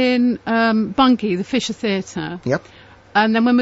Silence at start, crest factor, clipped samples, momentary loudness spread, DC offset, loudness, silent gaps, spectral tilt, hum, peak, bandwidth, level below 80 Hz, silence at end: 0 s; 14 dB; under 0.1%; 8 LU; under 0.1%; -18 LUFS; none; -5.5 dB/octave; none; -4 dBFS; 8 kHz; -52 dBFS; 0 s